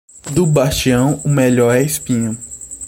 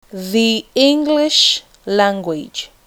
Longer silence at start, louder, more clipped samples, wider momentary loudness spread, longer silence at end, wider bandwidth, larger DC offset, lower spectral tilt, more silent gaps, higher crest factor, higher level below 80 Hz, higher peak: about the same, 0.15 s vs 0.15 s; about the same, -15 LUFS vs -15 LUFS; neither; second, 9 LU vs 12 LU; second, 0 s vs 0.2 s; second, 16.5 kHz vs 19.5 kHz; neither; first, -5.5 dB/octave vs -3 dB/octave; neither; about the same, 14 dB vs 16 dB; first, -38 dBFS vs -56 dBFS; about the same, -2 dBFS vs 0 dBFS